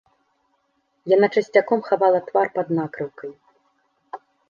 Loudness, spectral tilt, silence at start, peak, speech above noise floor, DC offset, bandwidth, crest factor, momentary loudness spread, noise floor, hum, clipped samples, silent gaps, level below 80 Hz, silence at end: -20 LUFS; -7 dB/octave; 1.05 s; -2 dBFS; 49 dB; under 0.1%; 7.2 kHz; 20 dB; 21 LU; -69 dBFS; none; under 0.1%; none; -74 dBFS; 0.3 s